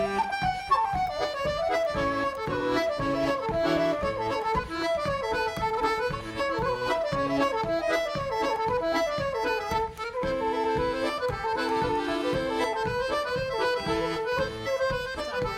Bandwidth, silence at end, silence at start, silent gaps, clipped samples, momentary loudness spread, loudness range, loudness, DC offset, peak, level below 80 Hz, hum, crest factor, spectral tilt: 16.5 kHz; 0 s; 0 s; none; under 0.1%; 3 LU; 1 LU; -28 LUFS; under 0.1%; -12 dBFS; -46 dBFS; none; 16 dB; -5 dB/octave